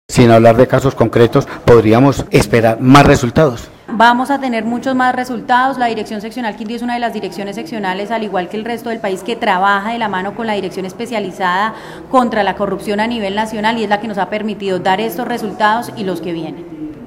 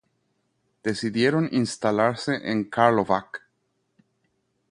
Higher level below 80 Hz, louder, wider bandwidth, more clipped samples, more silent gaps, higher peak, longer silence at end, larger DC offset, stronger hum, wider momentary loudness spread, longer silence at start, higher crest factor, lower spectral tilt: first, -38 dBFS vs -62 dBFS; first, -14 LUFS vs -24 LUFS; first, 16.5 kHz vs 11 kHz; first, 0.3% vs under 0.1%; neither; about the same, 0 dBFS vs -2 dBFS; second, 0 s vs 1.35 s; neither; neither; first, 13 LU vs 10 LU; second, 0.1 s vs 0.85 s; second, 14 dB vs 22 dB; about the same, -6 dB/octave vs -5.5 dB/octave